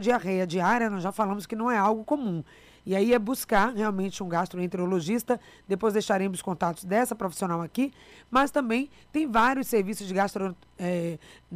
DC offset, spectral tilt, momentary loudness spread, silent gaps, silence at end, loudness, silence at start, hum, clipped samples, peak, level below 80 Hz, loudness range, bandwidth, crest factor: under 0.1%; -5.5 dB/octave; 8 LU; none; 0 s; -27 LUFS; 0 s; none; under 0.1%; -12 dBFS; -56 dBFS; 1 LU; 15.5 kHz; 14 dB